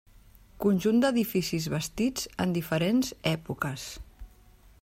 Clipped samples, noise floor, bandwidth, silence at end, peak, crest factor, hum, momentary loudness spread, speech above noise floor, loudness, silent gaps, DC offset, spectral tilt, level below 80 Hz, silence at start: under 0.1%; -56 dBFS; 16 kHz; 0.55 s; -12 dBFS; 16 dB; none; 9 LU; 29 dB; -28 LUFS; none; under 0.1%; -5.5 dB/octave; -52 dBFS; 0.6 s